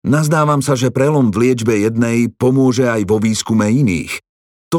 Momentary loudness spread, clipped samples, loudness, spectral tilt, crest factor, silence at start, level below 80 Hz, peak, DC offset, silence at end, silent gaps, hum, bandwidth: 3 LU; under 0.1%; -14 LUFS; -6 dB/octave; 12 dB; 0.05 s; -48 dBFS; -2 dBFS; under 0.1%; 0 s; 4.29-4.71 s; none; 16.5 kHz